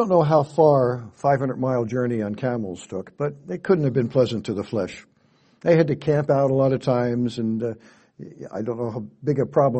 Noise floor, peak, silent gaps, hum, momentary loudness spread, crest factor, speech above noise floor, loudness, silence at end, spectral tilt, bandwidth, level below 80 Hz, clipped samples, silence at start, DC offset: -60 dBFS; -4 dBFS; none; none; 13 LU; 18 dB; 38 dB; -22 LUFS; 0 s; -8 dB/octave; 8.4 kHz; -60 dBFS; under 0.1%; 0 s; under 0.1%